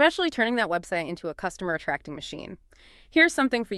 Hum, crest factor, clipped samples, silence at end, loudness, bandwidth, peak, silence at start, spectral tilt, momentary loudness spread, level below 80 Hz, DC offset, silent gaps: none; 22 dB; under 0.1%; 0 s; -25 LUFS; 12.5 kHz; -4 dBFS; 0 s; -4 dB/octave; 17 LU; -56 dBFS; under 0.1%; none